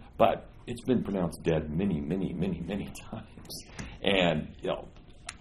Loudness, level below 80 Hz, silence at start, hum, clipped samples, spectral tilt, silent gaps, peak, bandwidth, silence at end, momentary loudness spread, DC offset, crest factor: -30 LUFS; -48 dBFS; 0 s; none; under 0.1%; -6 dB/octave; none; -8 dBFS; 13 kHz; 0 s; 17 LU; under 0.1%; 24 dB